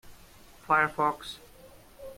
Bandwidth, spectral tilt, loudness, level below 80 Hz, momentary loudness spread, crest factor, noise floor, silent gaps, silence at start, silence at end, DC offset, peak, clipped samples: 16.5 kHz; -4.5 dB/octave; -27 LUFS; -60 dBFS; 22 LU; 22 dB; -53 dBFS; none; 0.05 s; 0.05 s; under 0.1%; -10 dBFS; under 0.1%